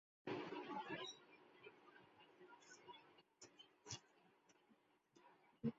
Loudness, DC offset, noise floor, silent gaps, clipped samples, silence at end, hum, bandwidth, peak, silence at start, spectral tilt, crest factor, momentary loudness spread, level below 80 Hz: -54 LUFS; under 0.1%; -78 dBFS; none; under 0.1%; 0 s; none; 7.6 kHz; -32 dBFS; 0.25 s; -3.5 dB/octave; 24 dB; 18 LU; -88 dBFS